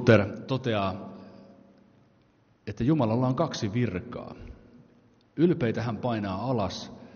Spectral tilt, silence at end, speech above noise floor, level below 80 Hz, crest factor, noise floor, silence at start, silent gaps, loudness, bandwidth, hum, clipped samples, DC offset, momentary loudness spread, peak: -6.5 dB/octave; 0.05 s; 37 dB; -56 dBFS; 22 dB; -63 dBFS; 0 s; none; -28 LUFS; 6.8 kHz; none; under 0.1%; under 0.1%; 20 LU; -6 dBFS